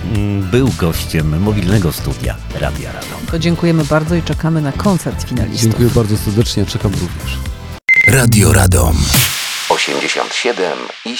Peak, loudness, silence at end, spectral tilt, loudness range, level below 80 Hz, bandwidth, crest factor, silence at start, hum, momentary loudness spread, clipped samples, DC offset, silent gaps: 0 dBFS; -14 LUFS; 0 s; -4.5 dB/octave; 5 LU; -26 dBFS; 20 kHz; 14 dB; 0 s; none; 12 LU; under 0.1%; under 0.1%; none